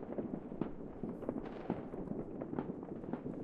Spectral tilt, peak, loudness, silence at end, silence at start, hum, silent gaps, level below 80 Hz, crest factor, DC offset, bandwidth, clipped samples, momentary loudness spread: -10 dB/octave; -22 dBFS; -44 LUFS; 0 s; 0 s; none; none; -58 dBFS; 22 dB; under 0.1%; 5.4 kHz; under 0.1%; 3 LU